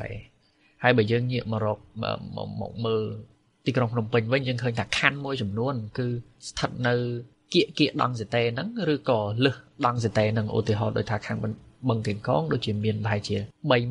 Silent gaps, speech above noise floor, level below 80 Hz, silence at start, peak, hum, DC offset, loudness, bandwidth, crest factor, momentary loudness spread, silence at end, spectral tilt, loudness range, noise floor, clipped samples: none; 33 dB; -56 dBFS; 0 s; -2 dBFS; none; under 0.1%; -27 LUFS; 10.5 kHz; 24 dB; 9 LU; 0 s; -6 dB/octave; 2 LU; -59 dBFS; under 0.1%